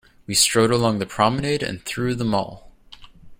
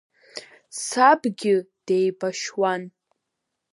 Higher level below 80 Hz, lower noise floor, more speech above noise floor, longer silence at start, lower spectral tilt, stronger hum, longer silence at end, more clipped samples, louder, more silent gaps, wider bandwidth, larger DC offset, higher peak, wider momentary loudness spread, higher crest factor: first, -48 dBFS vs -80 dBFS; second, -45 dBFS vs -81 dBFS; second, 24 dB vs 59 dB; about the same, 0.3 s vs 0.35 s; about the same, -3.5 dB/octave vs -4 dB/octave; neither; second, 0.05 s vs 0.85 s; neither; about the same, -20 LUFS vs -22 LUFS; neither; first, 16.5 kHz vs 11.5 kHz; neither; about the same, -4 dBFS vs -2 dBFS; second, 9 LU vs 22 LU; about the same, 18 dB vs 22 dB